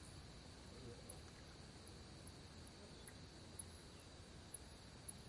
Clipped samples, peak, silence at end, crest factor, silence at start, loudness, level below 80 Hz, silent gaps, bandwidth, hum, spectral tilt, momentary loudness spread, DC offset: under 0.1%; -36 dBFS; 0 s; 22 dB; 0 s; -57 LUFS; -66 dBFS; none; 11.5 kHz; none; -3.5 dB/octave; 4 LU; under 0.1%